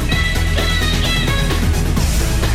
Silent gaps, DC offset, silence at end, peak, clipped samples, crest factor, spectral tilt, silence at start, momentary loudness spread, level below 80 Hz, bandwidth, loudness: none; under 0.1%; 0 s; -6 dBFS; under 0.1%; 10 dB; -4 dB/octave; 0 s; 1 LU; -18 dBFS; 16 kHz; -17 LUFS